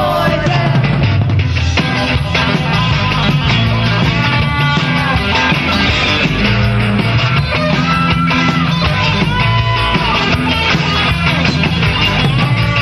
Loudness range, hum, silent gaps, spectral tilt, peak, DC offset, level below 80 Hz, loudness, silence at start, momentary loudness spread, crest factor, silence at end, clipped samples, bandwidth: 1 LU; none; none; -6 dB/octave; 0 dBFS; under 0.1%; -26 dBFS; -12 LUFS; 0 s; 2 LU; 12 dB; 0 s; under 0.1%; 13 kHz